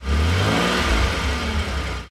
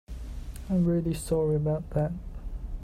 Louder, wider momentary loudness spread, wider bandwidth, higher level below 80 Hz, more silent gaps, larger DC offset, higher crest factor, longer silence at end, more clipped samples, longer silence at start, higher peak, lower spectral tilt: first, -21 LUFS vs -28 LUFS; second, 6 LU vs 16 LU; about the same, 14.5 kHz vs 15 kHz; first, -24 dBFS vs -38 dBFS; neither; neither; about the same, 14 dB vs 14 dB; about the same, 0 s vs 0 s; neither; about the same, 0 s vs 0.1 s; first, -8 dBFS vs -14 dBFS; second, -5 dB/octave vs -8 dB/octave